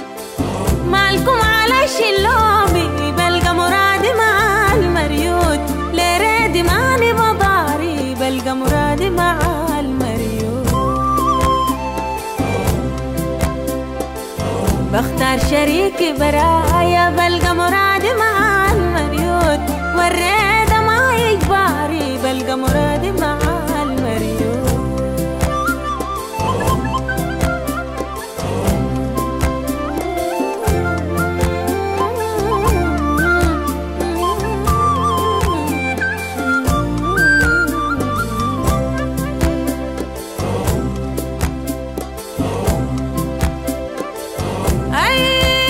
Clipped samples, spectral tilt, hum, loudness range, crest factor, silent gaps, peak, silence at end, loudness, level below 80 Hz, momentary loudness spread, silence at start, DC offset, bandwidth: under 0.1%; -5 dB/octave; none; 6 LU; 12 dB; none; -4 dBFS; 0 s; -16 LUFS; -26 dBFS; 9 LU; 0 s; under 0.1%; 16.5 kHz